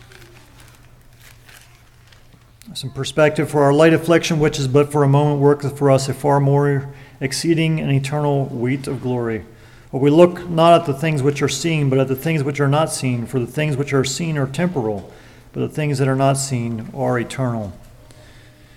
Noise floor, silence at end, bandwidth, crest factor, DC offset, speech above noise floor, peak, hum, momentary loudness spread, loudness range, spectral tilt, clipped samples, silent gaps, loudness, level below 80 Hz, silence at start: -47 dBFS; 0.95 s; 15 kHz; 18 dB; under 0.1%; 30 dB; 0 dBFS; none; 12 LU; 6 LU; -6 dB/octave; under 0.1%; none; -18 LUFS; -48 dBFS; 0.2 s